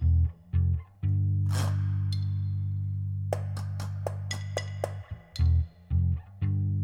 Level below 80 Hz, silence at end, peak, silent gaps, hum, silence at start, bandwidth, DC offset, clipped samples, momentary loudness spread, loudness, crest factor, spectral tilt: -36 dBFS; 0 s; -12 dBFS; none; 50 Hz at -60 dBFS; 0 s; 11.5 kHz; under 0.1%; under 0.1%; 8 LU; -30 LUFS; 16 dB; -7 dB/octave